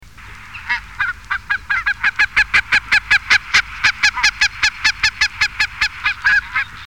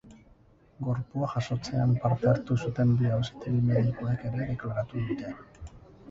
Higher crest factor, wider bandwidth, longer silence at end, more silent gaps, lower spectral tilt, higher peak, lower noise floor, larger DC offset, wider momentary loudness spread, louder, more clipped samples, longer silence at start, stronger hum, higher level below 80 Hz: about the same, 16 dB vs 16 dB; first, 17 kHz vs 7.6 kHz; about the same, 0 s vs 0 s; neither; second, 0.5 dB/octave vs -8.5 dB/octave; first, -2 dBFS vs -12 dBFS; second, -37 dBFS vs -59 dBFS; first, 0.6% vs under 0.1%; second, 9 LU vs 12 LU; first, -15 LUFS vs -29 LUFS; neither; first, 0.2 s vs 0.05 s; neither; first, -40 dBFS vs -52 dBFS